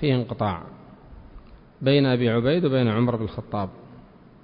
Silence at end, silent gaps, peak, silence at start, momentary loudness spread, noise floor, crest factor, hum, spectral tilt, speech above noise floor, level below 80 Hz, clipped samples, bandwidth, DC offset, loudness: 0.45 s; none; -8 dBFS; 0 s; 12 LU; -48 dBFS; 16 dB; none; -11.5 dB/octave; 26 dB; -50 dBFS; under 0.1%; 5.2 kHz; under 0.1%; -23 LUFS